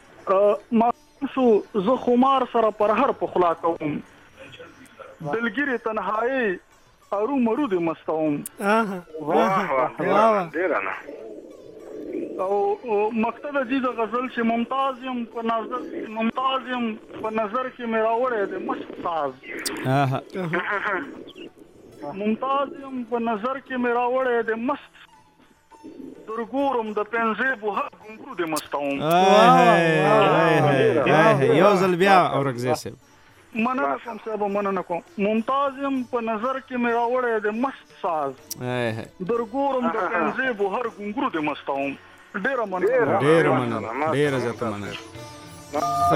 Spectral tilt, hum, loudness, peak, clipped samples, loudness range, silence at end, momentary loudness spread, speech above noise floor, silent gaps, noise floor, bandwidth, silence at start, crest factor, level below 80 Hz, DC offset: -6 dB/octave; none; -23 LUFS; -2 dBFS; under 0.1%; 9 LU; 0 s; 14 LU; 34 dB; none; -56 dBFS; 16 kHz; 0.2 s; 20 dB; -62 dBFS; under 0.1%